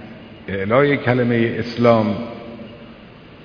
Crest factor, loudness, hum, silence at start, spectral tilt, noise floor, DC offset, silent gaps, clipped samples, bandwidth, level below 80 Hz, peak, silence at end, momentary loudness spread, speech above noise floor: 20 dB; -18 LUFS; none; 0 s; -8.5 dB/octave; -41 dBFS; under 0.1%; none; under 0.1%; 5.4 kHz; -52 dBFS; 0 dBFS; 0 s; 21 LU; 24 dB